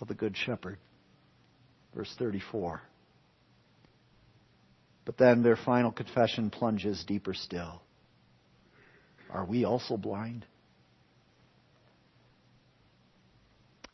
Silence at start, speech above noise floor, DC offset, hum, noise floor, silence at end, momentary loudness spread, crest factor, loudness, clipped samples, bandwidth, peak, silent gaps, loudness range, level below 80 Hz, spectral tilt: 0 s; 35 dB; under 0.1%; none; -66 dBFS; 3.5 s; 20 LU; 26 dB; -31 LUFS; under 0.1%; 6.2 kHz; -8 dBFS; none; 13 LU; -66 dBFS; -7 dB/octave